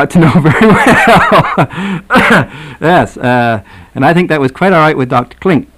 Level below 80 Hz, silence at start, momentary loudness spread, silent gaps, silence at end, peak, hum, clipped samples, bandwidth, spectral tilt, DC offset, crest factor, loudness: -34 dBFS; 0 s; 9 LU; none; 0.15 s; 0 dBFS; none; under 0.1%; 15 kHz; -6.5 dB/octave; under 0.1%; 8 dB; -8 LUFS